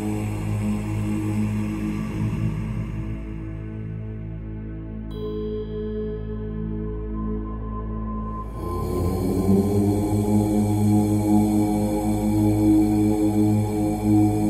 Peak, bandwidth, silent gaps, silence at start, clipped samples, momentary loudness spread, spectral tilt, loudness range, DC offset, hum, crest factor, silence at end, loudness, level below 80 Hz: -8 dBFS; 15 kHz; none; 0 s; under 0.1%; 13 LU; -8 dB/octave; 11 LU; under 0.1%; none; 14 dB; 0 s; -24 LUFS; -34 dBFS